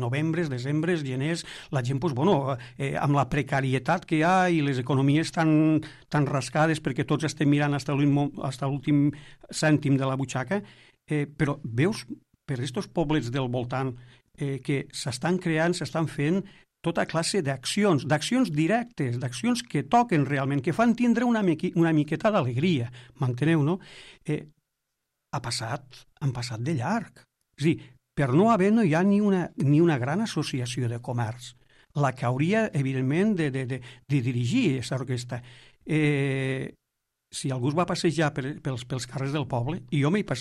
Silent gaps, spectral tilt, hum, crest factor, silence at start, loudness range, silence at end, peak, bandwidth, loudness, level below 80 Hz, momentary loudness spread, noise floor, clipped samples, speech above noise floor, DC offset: none; -6.5 dB/octave; none; 16 dB; 0 s; 6 LU; 0 s; -10 dBFS; 12.5 kHz; -26 LUFS; -58 dBFS; 11 LU; -82 dBFS; under 0.1%; 56 dB; under 0.1%